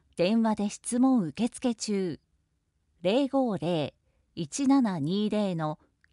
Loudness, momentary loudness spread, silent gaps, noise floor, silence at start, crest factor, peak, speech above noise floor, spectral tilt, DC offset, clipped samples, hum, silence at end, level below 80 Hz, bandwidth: -28 LUFS; 11 LU; none; -74 dBFS; 0.15 s; 14 dB; -14 dBFS; 47 dB; -5.5 dB/octave; under 0.1%; under 0.1%; none; 0.4 s; -66 dBFS; 11.5 kHz